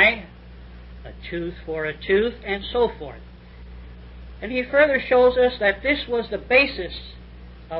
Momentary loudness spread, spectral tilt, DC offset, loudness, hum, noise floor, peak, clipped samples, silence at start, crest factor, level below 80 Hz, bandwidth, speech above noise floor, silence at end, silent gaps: 25 LU; -9.5 dB/octave; under 0.1%; -21 LUFS; 60 Hz at -40 dBFS; -42 dBFS; -4 dBFS; under 0.1%; 0 s; 20 dB; -42 dBFS; 5.4 kHz; 20 dB; 0 s; none